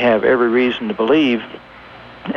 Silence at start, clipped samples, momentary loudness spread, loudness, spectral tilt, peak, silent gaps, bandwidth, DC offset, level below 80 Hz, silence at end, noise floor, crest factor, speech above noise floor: 0 s; under 0.1%; 19 LU; -16 LUFS; -7 dB/octave; -2 dBFS; none; 6.6 kHz; under 0.1%; -52 dBFS; 0 s; -39 dBFS; 14 dB; 23 dB